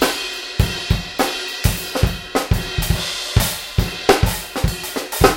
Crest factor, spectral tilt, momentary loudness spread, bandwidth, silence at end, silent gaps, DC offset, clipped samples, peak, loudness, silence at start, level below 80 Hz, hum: 20 dB; -4 dB/octave; 6 LU; 17 kHz; 0 s; none; under 0.1%; under 0.1%; 0 dBFS; -20 LUFS; 0 s; -26 dBFS; none